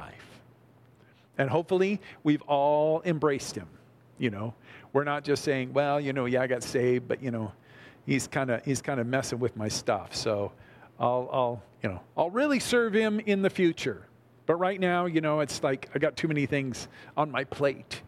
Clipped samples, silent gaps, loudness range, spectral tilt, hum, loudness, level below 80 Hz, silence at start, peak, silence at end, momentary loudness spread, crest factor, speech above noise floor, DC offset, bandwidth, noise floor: under 0.1%; none; 3 LU; -5.5 dB/octave; none; -28 LUFS; -64 dBFS; 0 s; -10 dBFS; 0.05 s; 10 LU; 18 dB; 31 dB; under 0.1%; 15 kHz; -59 dBFS